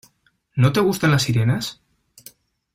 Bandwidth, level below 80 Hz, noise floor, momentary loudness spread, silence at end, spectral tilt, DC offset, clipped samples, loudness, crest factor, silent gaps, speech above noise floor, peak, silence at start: 16 kHz; -52 dBFS; -64 dBFS; 11 LU; 1 s; -5.5 dB/octave; under 0.1%; under 0.1%; -20 LUFS; 16 dB; none; 46 dB; -4 dBFS; 0.55 s